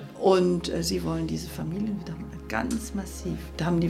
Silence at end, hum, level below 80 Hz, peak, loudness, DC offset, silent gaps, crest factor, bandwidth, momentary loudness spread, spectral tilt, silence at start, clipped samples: 0 s; none; -42 dBFS; -8 dBFS; -28 LUFS; under 0.1%; none; 20 dB; 15.5 kHz; 12 LU; -6 dB/octave; 0 s; under 0.1%